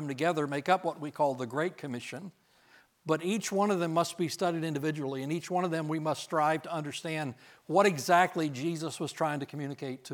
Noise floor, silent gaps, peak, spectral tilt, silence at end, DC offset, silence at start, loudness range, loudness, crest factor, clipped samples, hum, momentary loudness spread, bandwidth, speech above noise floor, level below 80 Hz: -62 dBFS; none; -10 dBFS; -5 dB/octave; 0 s; under 0.1%; 0 s; 3 LU; -31 LUFS; 20 dB; under 0.1%; none; 12 LU; 19 kHz; 32 dB; -84 dBFS